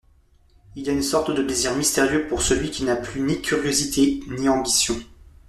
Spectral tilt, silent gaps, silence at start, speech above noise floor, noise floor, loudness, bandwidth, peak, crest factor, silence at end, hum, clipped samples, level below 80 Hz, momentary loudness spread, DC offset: -3 dB/octave; none; 0.75 s; 35 dB; -56 dBFS; -22 LUFS; 14 kHz; -6 dBFS; 16 dB; 0.35 s; none; under 0.1%; -42 dBFS; 6 LU; under 0.1%